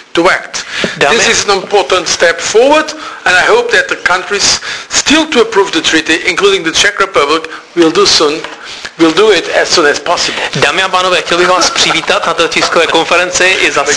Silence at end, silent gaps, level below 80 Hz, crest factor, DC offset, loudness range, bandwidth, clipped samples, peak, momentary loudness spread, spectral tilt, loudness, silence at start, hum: 0 s; none; -42 dBFS; 10 dB; under 0.1%; 1 LU; 11 kHz; 0.7%; 0 dBFS; 6 LU; -1.5 dB/octave; -9 LUFS; 0.15 s; none